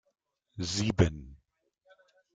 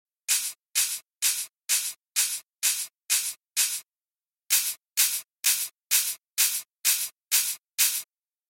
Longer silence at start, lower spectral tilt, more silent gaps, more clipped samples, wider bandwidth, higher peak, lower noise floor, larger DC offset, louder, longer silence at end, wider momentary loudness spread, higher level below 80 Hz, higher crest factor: first, 0.55 s vs 0.3 s; first, -5.5 dB/octave vs 5.5 dB/octave; second, none vs 7.13-7.17 s; neither; second, 9.4 kHz vs 17 kHz; about the same, -10 dBFS vs -8 dBFS; second, -73 dBFS vs under -90 dBFS; neither; second, -30 LUFS vs -25 LUFS; first, 1 s vs 0.45 s; first, 21 LU vs 5 LU; first, -50 dBFS vs -84 dBFS; about the same, 24 dB vs 22 dB